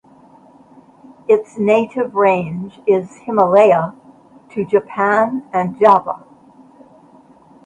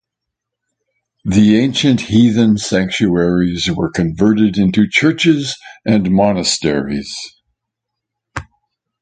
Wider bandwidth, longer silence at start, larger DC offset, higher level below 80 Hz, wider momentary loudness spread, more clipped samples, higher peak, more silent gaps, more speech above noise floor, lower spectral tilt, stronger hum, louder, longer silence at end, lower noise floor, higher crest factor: about the same, 9.2 kHz vs 9.4 kHz; about the same, 1.3 s vs 1.25 s; neither; second, -62 dBFS vs -40 dBFS; about the same, 15 LU vs 15 LU; neither; about the same, 0 dBFS vs 0 dBFS; neither; second, 32 dB vs 66 dB; first, -7.5 dB/octave vs -5.5 dB/octave; neither; about the same, -16 LUFS vs -14 LUFS; first, 1.5 s vs 0.6 s; second, -46 dBFS vs -79 dBFS; about the same, 18 dB vs 14 dB